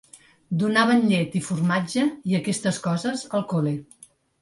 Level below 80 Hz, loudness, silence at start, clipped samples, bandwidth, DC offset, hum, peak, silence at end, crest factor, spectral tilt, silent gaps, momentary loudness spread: -64 dBFS; -23 LUFS; 0.15 s; under 0.1%; 11.5 kHz; under 0.1%; none; -6 dBFS; 0.6 s; 18 dB; -5.5 dB/octave; none; 8 LU